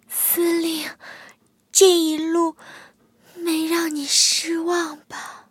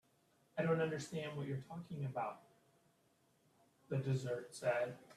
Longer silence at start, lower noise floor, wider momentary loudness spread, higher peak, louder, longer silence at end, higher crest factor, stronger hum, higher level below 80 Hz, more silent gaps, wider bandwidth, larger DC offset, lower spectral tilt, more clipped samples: second, 0.1 s vs 0.55 s; second, -54 dBFS vs -76 dBFS; first, 19 LU vs 9 LU; first, -2 dBFS vs -24 dBFS; first, -19 LUFS vs -41 LUFS; about the same, 0.1 s vs 0 s; about the same, 20 dB vs 18 dB; neither; about the same, -76 dBFS vs -80 dBFS; neither; first, 17 kHz vs 13.5 kHz; neither; second, -0.5 dB/octave vs -6.5 dB/octave; neither